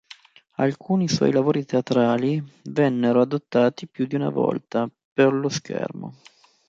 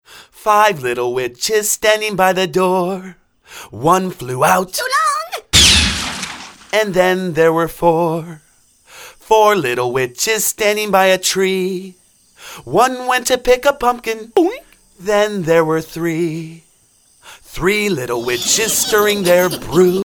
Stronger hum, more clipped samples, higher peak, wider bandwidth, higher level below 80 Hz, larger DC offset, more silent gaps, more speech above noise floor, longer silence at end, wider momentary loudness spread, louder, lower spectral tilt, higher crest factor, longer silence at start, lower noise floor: neither; neither; second, -4 dBFS vs 0 dBFS; second, 7.8 kHz vs over 20 kHz; second, -64 dBFS vs -38 dBFS; neither; first, 5.05-5.16 s vs none; second, 27 dB vs 38 dB; first, 0.55 s vs 0 s; about the same, 10 LU vs 10 LU; second, -23 LUFS vs -15 LUFS; first, -6.5 dB/octave vs -3 dB/octave; about the same, 18 dB vs 16 dB; first, 0.6 s vs 0.1 s; second, -49 dBFS vs -54 dBFS